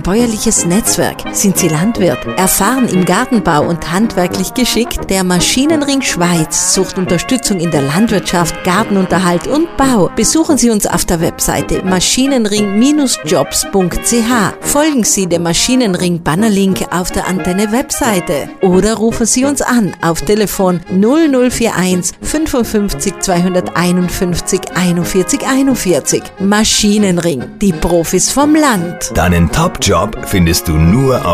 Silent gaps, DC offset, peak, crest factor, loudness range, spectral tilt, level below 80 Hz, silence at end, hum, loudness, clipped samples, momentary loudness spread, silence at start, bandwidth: none; under 0.1%; 0 dBFS; 12 dB; 2 LU; -4 dB/octave; -30 dBFS; 0 s; none; -12 LUFS; under 0.1%; 5 LU; 0 s; 16 kHz